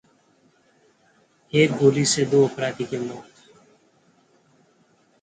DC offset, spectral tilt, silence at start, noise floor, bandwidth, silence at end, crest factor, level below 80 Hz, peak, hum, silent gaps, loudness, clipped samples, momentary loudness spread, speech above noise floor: under 0.1%; -4.5 dB/octave; 1.55 s; -61 dBFS; 9.6 kHz; 2 s; 20 dB; -64 dBFS; -4 dBFS; none; none; -21 LUFS; under 0.1%; 13 LU; 41 dB